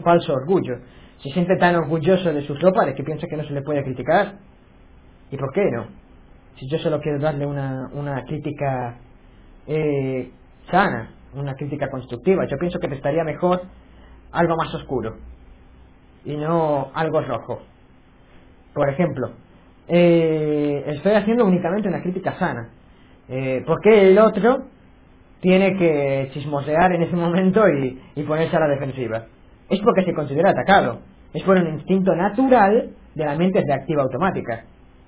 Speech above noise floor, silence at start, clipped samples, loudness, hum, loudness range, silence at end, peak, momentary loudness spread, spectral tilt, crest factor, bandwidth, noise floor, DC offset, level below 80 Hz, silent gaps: 31 dB; 0 s; under 0.1%; -20 LUFS; none; 8 LU; 0.45 s; -2 dBFS; 14 LU; -11 dB/octave; 18 dB; 4 kHz; -50 dBFS; 0.1%; -48 dBFS; none